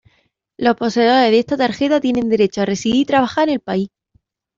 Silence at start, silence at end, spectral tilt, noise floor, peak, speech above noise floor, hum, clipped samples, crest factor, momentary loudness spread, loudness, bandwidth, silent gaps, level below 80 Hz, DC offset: 0.6 s; 0.7 s; -5 dB/octave; -63 dBFS; -2 dBFS; 47 dB; none; under 0.1%; 14 dB; 7 LU; -16 LUFS; 7.6 kHz; none; -54 dBFS; under 0.1%